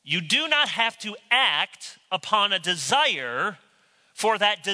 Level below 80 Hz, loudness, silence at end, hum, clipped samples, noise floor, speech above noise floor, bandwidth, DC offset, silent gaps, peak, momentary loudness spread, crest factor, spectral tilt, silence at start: -80 dBFS; -22 LUFS; 0 s; none; under 0.1%; -62 dBFS; 38 dB; 11 kHz; under 0.1%; none; -6 dBFS; 10 LU; 20 dB; -1.5 dB/octave; 0.05 s